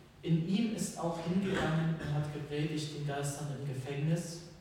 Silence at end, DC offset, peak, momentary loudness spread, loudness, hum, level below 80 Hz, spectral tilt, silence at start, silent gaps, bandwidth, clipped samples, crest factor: 0 s; under 0.1%; -20 dBFS; 7 LU; -35 LUFS; none; -60 dBFS; -6 dB/octave; 0 s; none; 16 kHz; under 0.1%; 14 dB